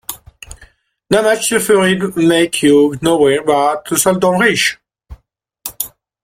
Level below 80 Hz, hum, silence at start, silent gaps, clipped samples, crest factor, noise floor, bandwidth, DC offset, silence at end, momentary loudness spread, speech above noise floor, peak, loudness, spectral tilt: -46 dBFS; none; 0.1 s; none; under 0.1%; 14 dB; -59 dBFS; 16.5 kHz; under 0.1%; 0.35 s; 13 LU; 46 dB; 0 dBFS; -13 LUFS; -4 dB/octave